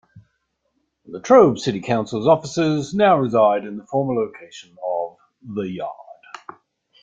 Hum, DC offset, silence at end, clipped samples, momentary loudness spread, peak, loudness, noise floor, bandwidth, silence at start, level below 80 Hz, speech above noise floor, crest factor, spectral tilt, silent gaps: none; under 0.1%; 0.9 s; under 0.1%; 24 LU; -2 dBFS; -19 LUFS; -71 dBFS; 7.8 kHz; 0.15 s; -60 dBFS; 53 dB; 20 dB; -6.5 dB/octave; none